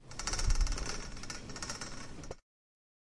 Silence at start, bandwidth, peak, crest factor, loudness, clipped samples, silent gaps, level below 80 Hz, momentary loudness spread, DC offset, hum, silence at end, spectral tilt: 0 s; 11.5 kHz; -18 dBFS; 20 dB; -39 LUFS; under 0.1%; none; -38 dBFS; 14 LU; under 0.1%; none; 0.7 s; -3 dB/octave